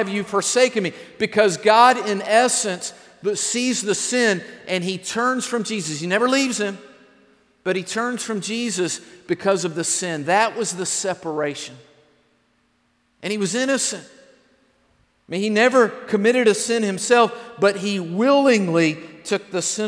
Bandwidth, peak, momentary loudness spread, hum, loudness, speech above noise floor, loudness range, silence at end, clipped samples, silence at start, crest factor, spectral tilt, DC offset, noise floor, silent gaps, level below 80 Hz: 11 kHz; -2 dBFS; 11 LU; none; -20 LUFS; 45 dB; 8 LU; 0 s; under 0.1%; 0 s; 20 dB; -3 dB/octave; under 0.1%; -65 dBFS; none; -70 dBFS